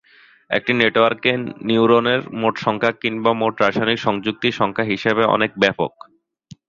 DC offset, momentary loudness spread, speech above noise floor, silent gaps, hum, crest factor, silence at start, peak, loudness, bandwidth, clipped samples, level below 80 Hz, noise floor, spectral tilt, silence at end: under 0.1%; 7 LU; 28 dB; none; none; 18 dB; 0.5 s; -2 dBFS; -18 LUFS; 7.4 kHz; under 0.1%; -56 dBFS; -46 dBFS; -6 dB/octave; 0.8 s